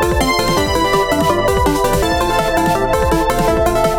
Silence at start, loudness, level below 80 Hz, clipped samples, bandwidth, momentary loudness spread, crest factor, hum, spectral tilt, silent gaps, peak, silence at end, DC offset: 0 s; -15 LUFS; -24 dBFS; under 0.1%; 17.5 kHz; 1 LU; 12 dB; none; -4.5 dB/octave; none; -2 dBFS; 0 s; under 0.1%